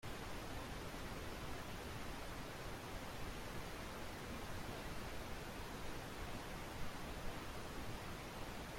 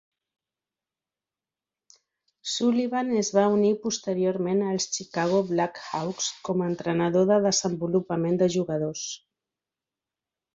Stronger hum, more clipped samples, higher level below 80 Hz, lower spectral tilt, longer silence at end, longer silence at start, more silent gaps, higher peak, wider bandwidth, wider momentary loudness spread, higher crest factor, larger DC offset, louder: neither; neither; first, -54 dBFS vs -68 dBFS; about the same, -4.5 dB/octave vs -4.5 dB/octave; second, 0 s vs 1.35 s; second, 0 s vs 2.45 s; neither; second, -34 dBFS vs -8 dBFS; first, 16.5 kHz vs 8 kHz; second, 1 LU vs 9 LU; second, 14 dB vs 20 dB; neither; second, -49 LUFS vs -25 LUFS